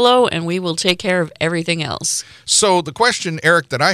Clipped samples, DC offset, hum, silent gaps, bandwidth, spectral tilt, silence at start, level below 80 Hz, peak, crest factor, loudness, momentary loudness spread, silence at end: under 0.1%; under 0.1%; none; none; 15 kHz; -3 dB/octave; 0 s; -52 dBFS; 0 dBFS; 16 dB; -16 LUFS; 7 LU; 0 s